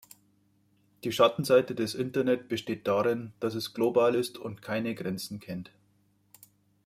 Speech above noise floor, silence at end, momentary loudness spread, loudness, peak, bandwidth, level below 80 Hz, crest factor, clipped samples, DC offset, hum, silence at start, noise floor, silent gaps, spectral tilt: 40 dB; 1.2 s; 14 LU; -29 LUFS; -10 dBFS; 16 kHz; -70 dBFS; 20 dB; under 0.1%; under 0.1%; 50 Hz at -60 dBFS; 1.05 s; -68 dBFS; none; -5.5 dB/octave